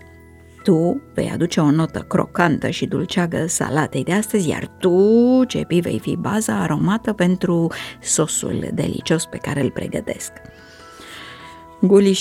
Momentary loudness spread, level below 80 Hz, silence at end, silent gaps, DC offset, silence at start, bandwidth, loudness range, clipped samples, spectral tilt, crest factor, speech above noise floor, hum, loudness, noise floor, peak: 13 LU; -50 dBFS; 0 s; none; under 0.1%; 0.6 s; 16 kHz; 5 LU; under 0.1%; -5.5 dB/octave; 18 dB; 26 dB; none; -19 LUFS; -44 dBFS; -2 dBFS